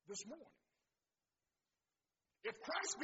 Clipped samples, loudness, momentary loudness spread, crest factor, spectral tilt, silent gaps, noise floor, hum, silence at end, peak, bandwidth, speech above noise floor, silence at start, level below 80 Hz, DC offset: under 0.1%; -47 LUFS; 13 LU; 22 dB; 0 dB/octave; none; under -90 dBFS; none; 0 s; -30 dBFS; 7.6 kHz; over 43 dB; 0.05 s; under -90 dBFS; under 0.1%